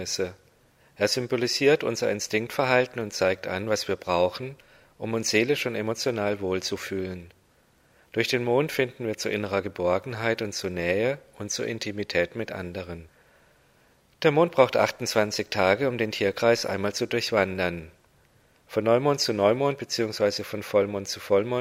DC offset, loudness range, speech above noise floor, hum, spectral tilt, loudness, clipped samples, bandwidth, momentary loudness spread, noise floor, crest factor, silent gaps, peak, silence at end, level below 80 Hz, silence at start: under 0.1%; 5 LU; 37 dB; none; -4 dB/octave; -26 LUFS; under 0.1%; 16 kHz; 10 LU; -62 dBFS; 22 dB; none; -4 dBFS; 0 s; -62 dBFS; 0 s